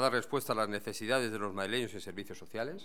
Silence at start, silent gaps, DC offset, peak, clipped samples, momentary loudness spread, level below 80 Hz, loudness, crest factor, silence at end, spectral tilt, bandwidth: 0 s; none; 0.4%; -14 dBFS; under 0.1%; 11 LU; -78 dBFS; -35 LUFS; 20 dB; 0 s; -4 dB/octave; 19 kHz